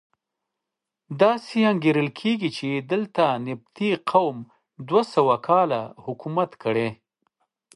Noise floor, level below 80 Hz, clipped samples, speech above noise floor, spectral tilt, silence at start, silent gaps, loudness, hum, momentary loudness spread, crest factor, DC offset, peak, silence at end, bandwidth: -85 dBFS; -72 dBFS; under 0.1%; 63 dB; -7 dB/octave; 1.1 s; none; -23 LUFS; none; 11 LU; 20 dB; under 0.1%; -4 dBFS; 0.8 s; 11.5 kHz